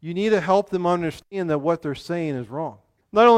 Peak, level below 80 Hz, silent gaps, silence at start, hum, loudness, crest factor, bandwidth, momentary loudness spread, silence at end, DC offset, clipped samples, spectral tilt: -4 dBFS; -58 dBFS; none; 0.05 s; none; -23 LUFS; 18 dB; 12 kHz; 11 LU; 0 s; under 0.1%; under 0.1%; -6.5 dB/octave